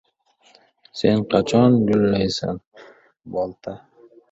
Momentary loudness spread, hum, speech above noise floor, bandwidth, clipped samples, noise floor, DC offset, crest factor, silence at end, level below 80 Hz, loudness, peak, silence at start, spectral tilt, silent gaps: 20 LU; none; 40 dB; 8 kHz; under 0.1%; -59 dBFS; under 0.1%; 20 dB; 0.55 s; -50 dBFS; -20 LUFS; -2 dBFS; 0.95 s; -7 dB/octave; 2.67-2.72 s